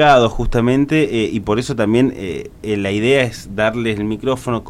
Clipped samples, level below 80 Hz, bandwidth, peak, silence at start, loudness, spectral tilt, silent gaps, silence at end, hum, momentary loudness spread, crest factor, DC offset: under 0.1%; -32 dBFS; 15.5 kHz; -2 dBFS; 0 s; -17 LUFS; -6 dB/octave; none; 0 s; none; 6 LU; 14 dB; under 0.1%